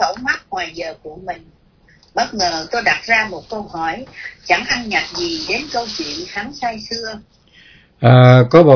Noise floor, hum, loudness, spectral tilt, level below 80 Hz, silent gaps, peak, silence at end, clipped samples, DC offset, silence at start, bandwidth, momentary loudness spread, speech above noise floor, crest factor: -51 dBFS; none; -16 LUFS; -5.5 dB/octave; -48 dBFS; none; 0 dBFS; 0 s; 0.2%; under 0.1%; 0 s; 5.4 kHz; 20 LU; 35 dB; 16 dB